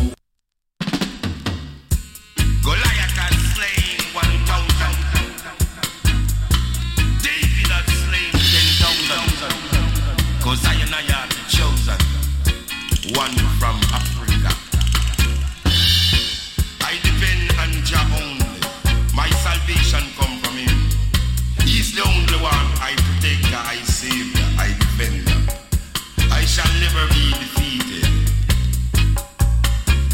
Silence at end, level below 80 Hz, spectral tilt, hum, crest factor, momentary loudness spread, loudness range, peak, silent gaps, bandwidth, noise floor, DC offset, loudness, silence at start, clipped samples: 0 s; -20 dBFS; -3.5 dB/octave; none; 14 dB; 6 LU; 3 LU; -4 dBFS; none; 17 kHz; -73 dBFS; under 0.1%; -18 LUFS; 0 s; under 0.1%